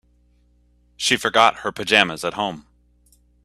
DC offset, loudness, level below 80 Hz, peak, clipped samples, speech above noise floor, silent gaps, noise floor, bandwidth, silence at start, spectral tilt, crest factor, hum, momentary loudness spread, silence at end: under 0.1%; -19 LUFS; -56 dBFS; 0 dBFS; under 0.1%; 39 dB; none; -59 dBFS; 14.5 kHz; 1 s; -2 dB/octave; 22 dB; 60 Hz at -50 dBFS; 11 LU; 0.85 s